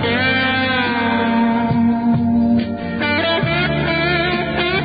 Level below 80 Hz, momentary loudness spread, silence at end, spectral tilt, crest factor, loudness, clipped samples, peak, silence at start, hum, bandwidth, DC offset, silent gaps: -38 dBFS; 3 LU; 0 s; -11 dB/octave; 12 dB; -17 LUFS; under 0.1%; -6 dBFS; 0 s; none; 5 kHz; under 0.1%; none